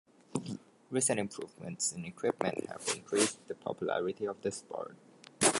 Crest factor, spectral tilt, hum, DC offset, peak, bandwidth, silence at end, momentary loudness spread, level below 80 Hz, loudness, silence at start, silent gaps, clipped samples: 22 dB; -3 dB/octave; none; under 0.1%; -12 dBFS; 12 kHz; 0 s; 13 LU; -72 dBFS; -35 LUFS; 0.3 s; none; under 0.1%